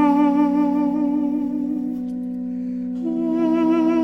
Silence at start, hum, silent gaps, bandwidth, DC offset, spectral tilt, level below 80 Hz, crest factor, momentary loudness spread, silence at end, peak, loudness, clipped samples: 0 s; none; none; 6 kHz; 0.1%; -8.5 dB/octave; -60 dBFS; 14 dB; 10 LU; 0 s; -6 dBFS; -21 LUFS; under 0.1%